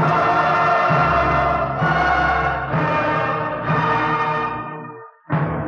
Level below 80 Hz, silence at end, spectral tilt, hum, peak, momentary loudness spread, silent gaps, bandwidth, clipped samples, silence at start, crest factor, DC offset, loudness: -38 dBFS; 0 s; -7 dB/octave; none; -6 dBFS; 9 LU; none; 7 kHz; under 0.1%; 0 s; 14 dB; under 0.1%; -18 LUFS